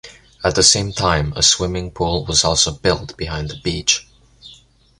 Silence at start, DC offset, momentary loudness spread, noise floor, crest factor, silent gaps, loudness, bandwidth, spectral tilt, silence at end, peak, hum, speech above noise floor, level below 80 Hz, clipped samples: 0.05 s; under 0.1%; 11 LU; -48 dBFS; 20 dB; none; -16 LUFS; 11.5 kHz; -2.5 dB/octave; 0.45 s; 0 dBFS; none; 30 dB; -34 dBFS; under 0.1%